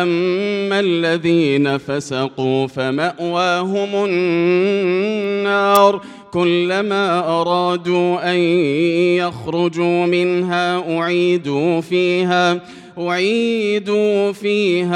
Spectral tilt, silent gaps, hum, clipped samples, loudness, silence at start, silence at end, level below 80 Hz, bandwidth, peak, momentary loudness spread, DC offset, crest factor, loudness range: -6 dB/octave; none; none; under 0.1%; -17 LUFS; 0 s; 0 s; -62 dBFS; 16 kHz; 0 dBFS; 5 LU; under 0.1%; 16 dB; 2 LU